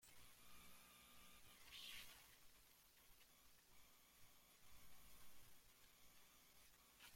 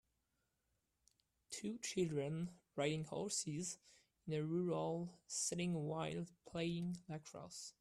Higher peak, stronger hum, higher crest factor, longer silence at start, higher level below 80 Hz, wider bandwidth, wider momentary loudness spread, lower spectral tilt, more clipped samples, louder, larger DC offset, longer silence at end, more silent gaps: second, -44 dBFS vs -26 dBFS; neither; about the same, 20 dB vs 20 dB; second, 0 s vs 1.5 s; about the same, -80 dBFS vs -76 dBFS; first, 16.5 kHz vs 13.5 kHz; about the same, 12 LU vs 11 LU; second, -1 dB/octave vs -4.5 dB/octave; neither; second, -65 LUFS vs -44 LUFS; neither; about the same, 0 s vs 0.1 s; neither